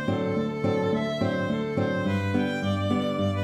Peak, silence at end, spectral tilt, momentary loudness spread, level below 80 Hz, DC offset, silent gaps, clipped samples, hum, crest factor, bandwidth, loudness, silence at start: -12 dBFS; 0 s; -7 dB/octave; 1 LU; -60 dBFS; under 0.1%; none; under 0.1%; none; 14 dB; 11 kHz; -26 LUFS; 0 s